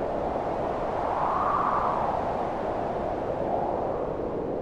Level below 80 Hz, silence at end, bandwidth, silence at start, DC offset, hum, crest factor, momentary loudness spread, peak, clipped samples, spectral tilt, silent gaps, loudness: -46 dBFS; 0 s; 10.5 kHz; 0 s; under 0.1%; none; 14 dB; 5 LU; -14 dBFS; under 0.1%; -7.5 dB/octave; none; -28 LUFS